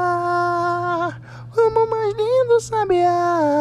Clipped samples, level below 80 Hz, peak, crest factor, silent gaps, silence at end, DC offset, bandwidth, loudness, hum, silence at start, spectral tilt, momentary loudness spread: under 0.1%; -52 dBFS; -6 dBFS; 14 dB; none; 0 s; under 0.1%; 11.5 kHz; -19 LUFS; none; 0 s; -6 dB/octave; 7 LU